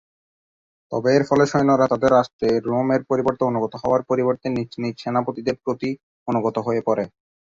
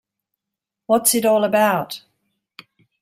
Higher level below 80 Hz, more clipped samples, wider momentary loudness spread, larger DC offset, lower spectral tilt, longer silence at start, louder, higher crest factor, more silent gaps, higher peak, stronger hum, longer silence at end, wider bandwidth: first, -56 dBFS vs -66 dBFS; neither; second, 9 LU vs 14 LU; neither; first, -7 dB/octave vs -3 dB/octave; about the same, 0.9 s vs 0.9 s; second, -21 LUFS vs -17 LUFS; about the same, 18 dB vs 20 dB; first, 2.33-2.39 s, 6.03-6.26 s vs none; about the same, -2 dBFS vs -2 dBFS; neither; second, 0.4 s vs 1.05 s; second, 7.6 kHz vs 16 kHz